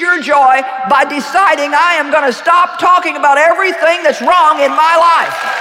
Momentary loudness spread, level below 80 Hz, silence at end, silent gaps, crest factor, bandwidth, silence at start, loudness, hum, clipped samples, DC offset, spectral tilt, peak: 4 LU; -58 dBFS; 0 s; none; 10 dB; 16.5 kHz; 0 s; -10 LUFS; none; under 0.1%; under 0.1%; -2 dB/octave; -2 dBFS